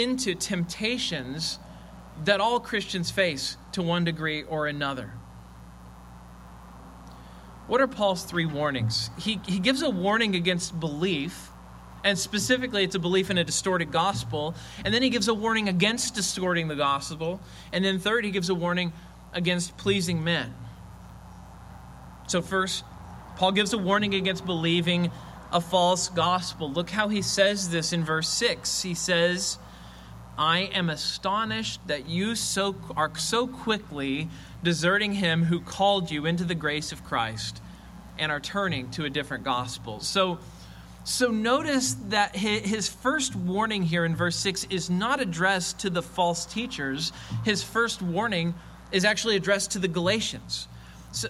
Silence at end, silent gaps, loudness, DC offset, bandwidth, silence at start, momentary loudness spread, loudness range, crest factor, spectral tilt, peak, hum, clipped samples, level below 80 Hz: 0 s; none; -26 LUFS; under 0.1%; 14 kHz; 0 s; 18 LU; 5 LU; 20 dB; -4 dB/octave; -6 dBFS; none; under 0.1%; -52 dBFS